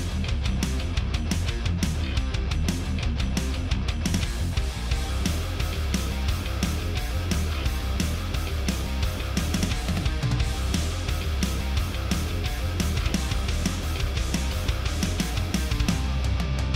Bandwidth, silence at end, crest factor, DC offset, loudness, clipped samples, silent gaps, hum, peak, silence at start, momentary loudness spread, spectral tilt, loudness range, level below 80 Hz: 16 kHz; 0 s; 14 dB; under 0.1%; -27 LUFS; under 0.1%; none; none; -12 dBFS; 0 s; 2 LU; -5 dB/octave; 1 LU; -28 dBFS